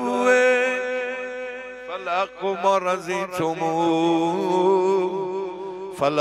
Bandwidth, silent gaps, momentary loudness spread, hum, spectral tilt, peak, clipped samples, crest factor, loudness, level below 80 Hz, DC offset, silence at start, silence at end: 14.5 kHz; none; 13 LU; none; -5 dB/octave; -6 dBFS; under 0.1%; 16 dB; -22 LUFS; -66 dBFS; under 0.1%; 0 s; 0 s